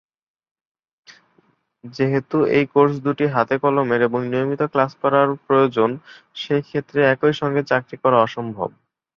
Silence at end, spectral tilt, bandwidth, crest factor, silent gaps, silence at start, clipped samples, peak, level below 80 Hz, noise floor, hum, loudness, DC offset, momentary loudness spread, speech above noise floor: 0.5 s; -7.5 dB/octave; 6.8 kHz; 18 dB; none; 1.1 s; under 0.1%; -2 dBFS; -62 dBFS; -62 dBFS; none; -19 LUFS; under 0.1%; 10 LU; 43 dB